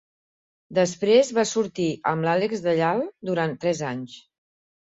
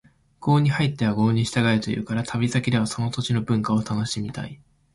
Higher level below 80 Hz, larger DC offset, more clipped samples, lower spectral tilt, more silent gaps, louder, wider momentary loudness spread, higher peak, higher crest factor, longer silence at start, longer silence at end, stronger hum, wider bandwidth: second, -66 dBFS vs -52 dBFS; neither; neither; about the same, -5 dB/octave vs -6 dB/octave; neither; about the same, -23 LUFS vs -23 LUFS; about the same, 9 LU vs 8 LU; about the same, -6 dBFS vs -8 dBFS; about the same, 18 dB vs 16 dB; first, 0.7 s vs 0.4 s; first, 0.75 s vs 0.4 s; neither; second, 8.2 kHz vs 11.5 kHz